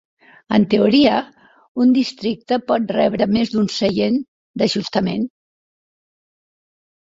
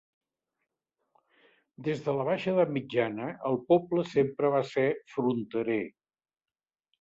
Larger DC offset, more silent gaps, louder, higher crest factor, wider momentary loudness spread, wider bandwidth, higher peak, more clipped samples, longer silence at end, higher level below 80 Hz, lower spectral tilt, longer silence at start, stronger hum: neither; first, 1.68-1.75 s, 4.28-4.54 s vs none; first, -18 LUFS vs -29 LUFS; about the same, 18 dB vs 18 dB; first, 11 LU vs 7 LU; about the same, 7.8 kHz vs 7.8 kHz; first, -2 dBFS vs -12 dBFS; neither; first, 1.75 s vs 1.1 s; first, -56 dBFS vs -72 dBFS; second, -6 dB/octave vs -7.5 dB/octave; second, 0.5 s vs 1.8 s; neither